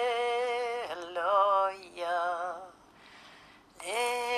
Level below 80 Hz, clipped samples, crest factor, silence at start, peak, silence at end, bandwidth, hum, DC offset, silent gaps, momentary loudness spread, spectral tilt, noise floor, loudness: -74 dBFS; under 0.1%; 18 dB; 0 s; -14 dBFS; 0 s; 14 kHz; none; under 0.1%; none; 18 LU; -1 dB/octave; -56 dBFS; -31 LUFS